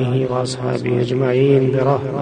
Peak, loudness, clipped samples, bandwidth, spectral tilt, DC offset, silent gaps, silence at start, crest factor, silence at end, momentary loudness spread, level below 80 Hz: -2 dBFS; -17 LUFS; under 0.1%; 9.6 kHz; -7.5 dB/octave; under 0.1%; none; 0 s; 14 dB; 0 s; 7 LU; -52 dBFS